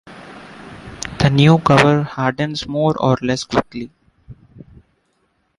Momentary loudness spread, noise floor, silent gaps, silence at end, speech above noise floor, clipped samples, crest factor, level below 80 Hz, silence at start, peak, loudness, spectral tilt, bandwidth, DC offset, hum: 25 LU; -65 dBFS; none; 1.25 s; 49 dB; under 0.1%; 18 dB; -44 dBFS; 0.05 s; -2 dBFS; -16 LUFS; -6 dB/octave; 11.5 kHz; under 0.1%; none